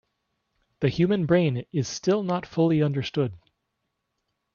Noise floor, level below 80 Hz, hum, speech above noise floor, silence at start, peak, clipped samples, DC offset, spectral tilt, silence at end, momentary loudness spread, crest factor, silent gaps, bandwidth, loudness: -79 dBFS; -60 dBFS; none; 55 dB; 0.8 s; -8 dBFS; under 0.1%; under 0.1%; -6.5 dB/octave; 1.2 s; 7 LU; 18 dB; none; 7.2 kHz; -25 LUFS